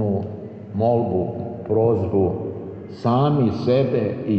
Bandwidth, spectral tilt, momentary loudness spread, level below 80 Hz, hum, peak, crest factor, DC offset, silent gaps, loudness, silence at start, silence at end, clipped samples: 6.6 kHz; -10 dB/octave; 12 LU; -52 dBFS; none; -6 dBFS; 14 dB; under 0.1%; none; -21 LUFS; 0 s; 0 s; under 0.1%